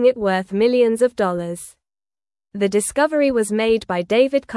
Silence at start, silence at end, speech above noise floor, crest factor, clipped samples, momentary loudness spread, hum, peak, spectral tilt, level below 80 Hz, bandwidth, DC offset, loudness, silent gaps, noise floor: 0 s; 0 s; over 72 dB; 16 dB; under 0.1%; 11 LU; none; -4 dBFS; -4.5 dB/octave; -54 dBFS; 12 kHz; under 0.1%; -19 LUFS; none; under -90 dBFS